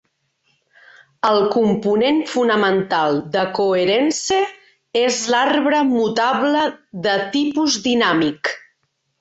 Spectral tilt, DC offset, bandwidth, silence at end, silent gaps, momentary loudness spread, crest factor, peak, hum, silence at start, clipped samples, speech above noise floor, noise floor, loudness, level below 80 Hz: -3.5 dB/octave; under 0.1%; 8.2 kHz; 0.65 s; none; 5 LU; 14 dB; -4 dBFS; none; 1.25 s; under 0.1%; 52 dB; -69 dBFS; -18 LUFS; -60 dBFS